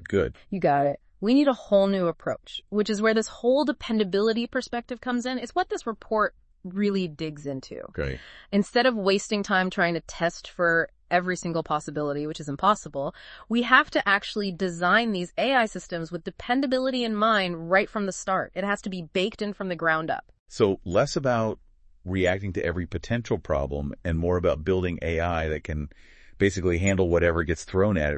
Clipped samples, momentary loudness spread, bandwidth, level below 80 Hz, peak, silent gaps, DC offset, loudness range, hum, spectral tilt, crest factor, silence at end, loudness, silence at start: under 0.1%; 11 LU; 8.8 kHz; -46 dBFS; -2 dBFS; 20.39-20.46 s; under 0.1%; 4 LU; none; -5.5 dB/octave; 22 dB; 0 s; -26 LUFS; 0 s